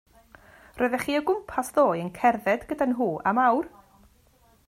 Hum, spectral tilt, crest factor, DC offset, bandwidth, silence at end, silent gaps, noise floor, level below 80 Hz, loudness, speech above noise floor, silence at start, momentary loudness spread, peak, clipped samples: none; -5.5 dB/octave; 18 dB; under 0.1%; 16 kHz; 1 s; none; -60 dBFS; -58 dBFS; -25 LUFS; 36 dB; 0.75 s; 6 LU; -10 dBFS; under 0.1%